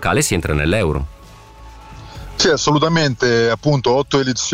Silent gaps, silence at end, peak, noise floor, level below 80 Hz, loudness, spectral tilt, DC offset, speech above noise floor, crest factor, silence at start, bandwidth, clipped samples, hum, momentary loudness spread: none; 0 s; -4 dBFS; -40 dBFS; -34 dBFS; -16 LUFS; -4.5 dB/octave; under 0.1%; 24 dB; 12 dB; 0 s; 16 kHz; under 0.1%; none; 13 LU